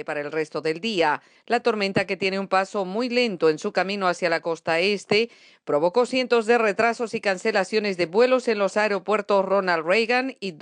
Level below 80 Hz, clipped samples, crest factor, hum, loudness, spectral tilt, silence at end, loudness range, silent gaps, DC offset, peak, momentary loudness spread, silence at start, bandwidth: -72 dBFS; under 0.1%; 16 dB; none; -23 LUFS; -4.5 dB/octave; 0 s; 2 LU; none; under 0.1%; -8 dBFS; 7 LU; 0 s; 10.5 kHz